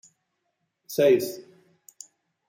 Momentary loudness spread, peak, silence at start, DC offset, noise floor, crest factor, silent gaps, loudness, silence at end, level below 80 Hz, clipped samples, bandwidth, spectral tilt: 26 LU; -8 dBFS; 0.9 s; under 0.1%; -78 dBFS; 20 dB; none; -23 LUFS; 1.1 s; -78 dBFS; under 0.1%; 17 kHz; -5 dB/octave